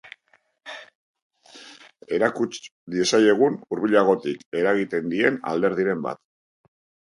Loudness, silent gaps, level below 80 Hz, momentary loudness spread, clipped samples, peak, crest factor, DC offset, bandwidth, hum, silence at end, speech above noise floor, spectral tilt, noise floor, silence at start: -22 LUFS; 0.95-1.14 s, 1.22-1.30 s, 2.71-2.87 s, 4.46-4.52 s; -68 dBFS; 21 LU; under 0.1%; -4 dBFS; 20 dB; under 0.1%; 11.5 kHz; none; 0.9 s; 43 dB; -4.5 dB/octave; -64 dBFS; 0.05 s